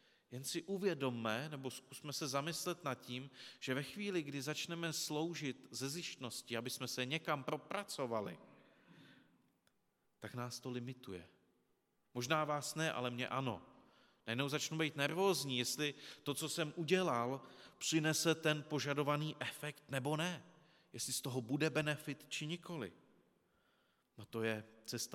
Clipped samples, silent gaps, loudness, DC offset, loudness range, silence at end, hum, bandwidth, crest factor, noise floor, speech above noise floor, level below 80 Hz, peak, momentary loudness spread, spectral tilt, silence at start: under 0.1%; none; -41 LUFS; under 0.1%; 8 LU; 0 s; none; 17.5 kHz; 22 dB; -80 dBFS; 40 dB; -86 dBFS; -20 dBFS; 12 LU; -4 dB/octave; 0.3 s